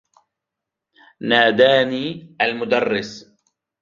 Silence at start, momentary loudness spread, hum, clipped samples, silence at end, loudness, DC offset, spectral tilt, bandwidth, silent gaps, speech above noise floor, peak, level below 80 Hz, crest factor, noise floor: 1.2 s; 15 LU; none; under 0.1%; 0.6 s; -18 LUFS; under 0.1%; -5 dB/octave; 7.4 kHz; none; 66 dB; -2 dBFS; -64 dBFS; 18 dB; -84 dBFS